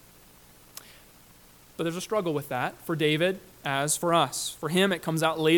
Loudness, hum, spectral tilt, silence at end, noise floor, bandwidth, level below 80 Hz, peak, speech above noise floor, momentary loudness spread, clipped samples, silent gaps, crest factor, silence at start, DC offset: -27 LUFS; 60 Hz at -60 dBFS; -4 dB/octave; 0 s; -54 dBFS; 19 kHz; -64 dBFS; -10 dBFS; 28 dB; 20 LU; under 0.1%; none; 18 dB; 0.9 s; under 0.1%